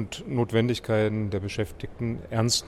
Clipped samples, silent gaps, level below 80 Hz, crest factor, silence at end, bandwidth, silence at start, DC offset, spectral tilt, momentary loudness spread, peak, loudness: under 0.1%; none; -48 dBFS; 16 dB; 0 s; 14 kHz; 0 s; under 0.1%; -5 dB/octave; 8 LU; -10 dBFS; -27 LUFS